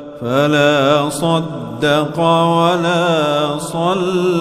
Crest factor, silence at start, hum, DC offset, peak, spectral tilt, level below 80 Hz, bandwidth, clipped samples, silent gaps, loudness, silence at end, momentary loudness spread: 14 dB; 0 s; none; under 0.1%; 0 dBFS; -5.5 dB/octave; -52 dBFS; 15.5 kHz; under 0.1%; none; -15 LUFS; 0 s; 7 LU